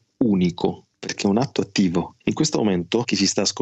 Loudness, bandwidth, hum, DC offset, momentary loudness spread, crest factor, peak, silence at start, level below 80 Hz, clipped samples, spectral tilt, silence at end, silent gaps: -22 LUFS; 8.6 kHz; none; under 0.1%; 7 LU; 16 dB; -4 dBFS; 0.2 s; -58 dBFS; under 0.1%; -4.5 dB/octave; 0 s; none